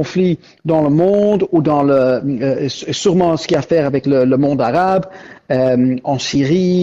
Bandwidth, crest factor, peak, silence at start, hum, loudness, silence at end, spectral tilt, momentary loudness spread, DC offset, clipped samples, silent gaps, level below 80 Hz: 8 kHz; 10 dB; -4 dBFS; 0 s; none; -15 LUFS; 0 s; -6.5 dB/octave; 6 LU; under 0.1%; under 0.1%; none; -48 dBFS